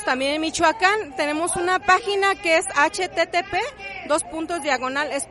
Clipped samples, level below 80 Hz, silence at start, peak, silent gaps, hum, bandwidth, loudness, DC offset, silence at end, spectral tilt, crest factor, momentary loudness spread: under 0.1%; -52 dBFS; 0 s; -2 dBFS; none; none; 11.5 kHz; -21 LUFS; under 0.1%; 0 s; -2 dB/octave; 20 dB; 8 LU